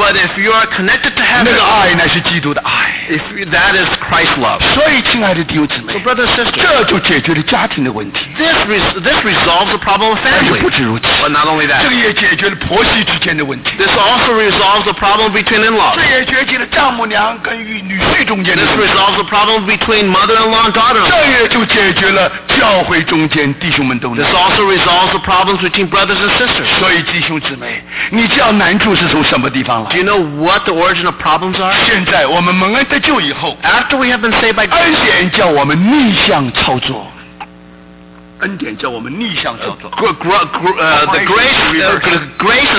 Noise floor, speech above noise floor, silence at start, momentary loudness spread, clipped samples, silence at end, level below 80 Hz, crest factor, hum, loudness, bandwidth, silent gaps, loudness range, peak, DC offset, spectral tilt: -36 dBFS; 25 dB; 0 s; 7 LU; under 0.1%; 0 s; -36 dBFS; 8 dB; none; -10 LUFS; 4 kHz; none; 3 LU; -4 dBFS; under 0.1%; -8 dB/octave